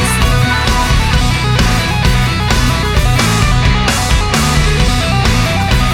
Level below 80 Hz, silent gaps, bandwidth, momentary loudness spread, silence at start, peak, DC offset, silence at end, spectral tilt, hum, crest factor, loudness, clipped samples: -16 dBFS; none; 17 kHz; 1 LU; 0 s; 0 dBFS; under 0.1%; 0 s; -4.5 dB/octave; none; 10 dB; -12 LUFS; under 0.1%